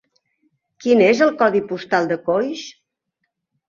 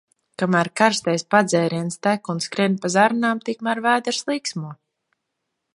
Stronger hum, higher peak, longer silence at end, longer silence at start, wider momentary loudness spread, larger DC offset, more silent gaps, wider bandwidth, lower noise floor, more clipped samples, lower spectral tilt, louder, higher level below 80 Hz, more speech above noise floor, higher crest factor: neither; about the same, -2 dBFS vs 0 dBFS; about the same, 0.95 s vs 1 s; first, 0.8 s vs 0.4 s; first, 13 LU vs 8 LU; neither; neither; second, 7.4 kHz vs 11.5 kHz; about the same, -76 dBFS vs -78 dBFS; neither; about the same, -5.5 dB/octave vs -4.5 dB/octave; first, -18 LUFS vs -21 LUFS; first, -64 dBFS vs -70 dBFS; about the same, 59 dB vs 58 dB; about the same, 18 dB vs 20 dB